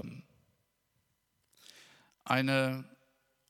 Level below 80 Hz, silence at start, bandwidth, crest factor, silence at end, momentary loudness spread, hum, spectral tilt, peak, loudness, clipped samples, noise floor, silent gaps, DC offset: -80 dBFS; 0 s; 15.5 kHz; 26 dB; 0.65 s; 26 LU; none; -5.5 dB/octave; -12 dBFS; -31 LUFS; under 0.1%; -78 dBFS; none; under 0.1%